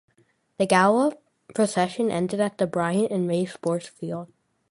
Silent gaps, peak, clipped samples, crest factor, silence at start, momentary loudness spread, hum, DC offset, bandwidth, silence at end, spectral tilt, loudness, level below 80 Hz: none; -4 dBFS; under 0.1%; 20 dB; 0.6 s; 14 LU; none; under 0.1%; 11.5 kHz; 0.45 s; -5.5 dB/octave; -24 LUFS; -66 dBFS